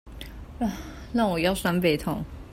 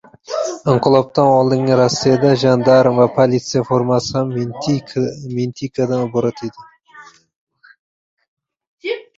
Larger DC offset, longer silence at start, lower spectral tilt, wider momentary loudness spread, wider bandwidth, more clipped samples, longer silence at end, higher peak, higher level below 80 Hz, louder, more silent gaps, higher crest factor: neither; second, 0.05 s vs 0.3 s; about the same, -5.5 dB/octave vs -6 dB/octave; first, 18 LU vs 11 LU; first, 16 kHz vs 7.8 kHz; neither; second, 0 s vs 0.15 s; second, -10 dBFS vs 0 dBFS; first, -44 dBFS vs -54 dBFS; second, -26 LUFS vs -16 LUFS; second, none vs 7.36-7.47 s, 7.79-8.17 s, 8.28-8.37 s, 8.67-8.78 s; about the same, 18 dB vs 16 dB